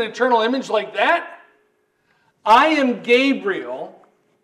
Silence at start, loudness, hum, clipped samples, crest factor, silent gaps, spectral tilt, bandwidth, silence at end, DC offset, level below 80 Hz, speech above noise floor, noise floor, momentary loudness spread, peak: 0 s; -17 LUFS; none; under 0.1%; 16 dB; none; -4 dB/octave; 12.5 kHz; 0.55 s; under 0.1%; -66 dBFS; 47 dB; -64 dBFS; 17 LU; -4 dBFS